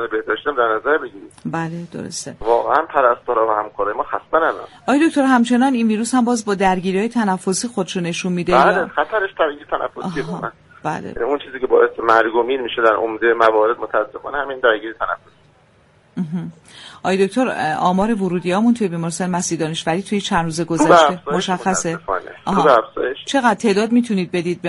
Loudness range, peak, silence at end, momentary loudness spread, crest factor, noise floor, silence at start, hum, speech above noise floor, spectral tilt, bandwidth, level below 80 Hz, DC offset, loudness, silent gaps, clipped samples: 4 LU; 0 dBFS; 0 s; 11 LU; 18 dB; -53 dBFS; 0 s; none; 35 dB; -5 dB/octave; 11.5 kHz; -50 dBFS; under 0.1%; -18 LUFS; none; under 0.1%